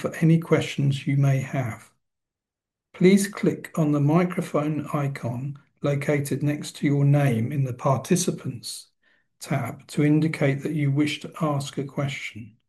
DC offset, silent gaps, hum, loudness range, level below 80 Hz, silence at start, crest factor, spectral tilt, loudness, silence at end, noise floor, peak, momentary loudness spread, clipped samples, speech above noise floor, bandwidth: under 0.1%; none; none; 2 LU; -66 dBFS; 0 s; 20 dB; -6.5 dB/octave; -24 LUFS; 0.2 s; -88 dBFS; -4 dBFS; 12 LU; under 0.1%; 64 dB; 12.5 kHz